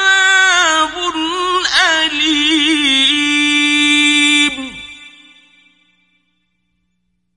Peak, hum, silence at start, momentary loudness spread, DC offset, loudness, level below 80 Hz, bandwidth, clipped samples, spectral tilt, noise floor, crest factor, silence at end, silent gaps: 0 dBFS; 60 Hz at -65 dBFS; 0 s; 8 LU; under 0.1%; -11 LUFS; -50 dBFS; 11.5 kHz; under 0.1%; 0.5 dB/octave; -68 dBFS; 14 dB; 2.3 s; none